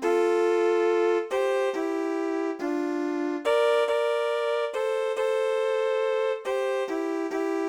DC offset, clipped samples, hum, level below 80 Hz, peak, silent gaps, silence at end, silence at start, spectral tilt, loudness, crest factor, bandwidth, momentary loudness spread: under 0.1%; under 0.1%; none; -74 dBFS; -12 dBFS; none; 0 s; 0 s; -2.5 dB/octave; -26 LUFS; 12 dB; 13.5 kHz; 5 LU